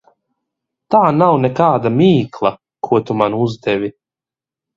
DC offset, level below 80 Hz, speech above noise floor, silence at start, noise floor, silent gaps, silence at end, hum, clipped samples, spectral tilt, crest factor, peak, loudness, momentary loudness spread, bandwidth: under 0.1%; -54 dBFS; 75 dB; 0.9 s; -89 dBFS; none; 0.85 s; none; under 0.1%; -8.5 dB/octave; 16 dB; 0 dBFS; -15 LUFS; 8 LU; 7.4 kHz